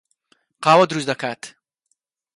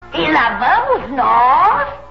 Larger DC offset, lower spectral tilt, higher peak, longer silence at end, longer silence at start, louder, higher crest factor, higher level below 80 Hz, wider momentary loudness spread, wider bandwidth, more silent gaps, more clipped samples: second, under 0.1% vs 0.8%; second, -4.5 dB/octave vs -6 dB/octave; about the same, -2 dBFS vs -2 dBFS; first, 0.9 s vs 0 s; first, 0.6 s vs 0 s; second, -18 LUFS vs -13 LUFS; first, 20 dB vs 12 dB; second, -68 dBFS vs -42 dBFS; first, 19 LU vs 6 LU; first, 11.5 kHz vs 6.6 kHz; neither; neither